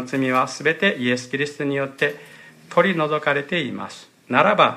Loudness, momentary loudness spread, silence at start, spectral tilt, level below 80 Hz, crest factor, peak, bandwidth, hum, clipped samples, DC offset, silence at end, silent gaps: -21 LUFS; 10 LU; 0 s; -5 dB/octave; -70 dBFS; 20 dB; -2 dBFS; 15 kHz; none; under 0.1%; under 0.1%; 0 s; none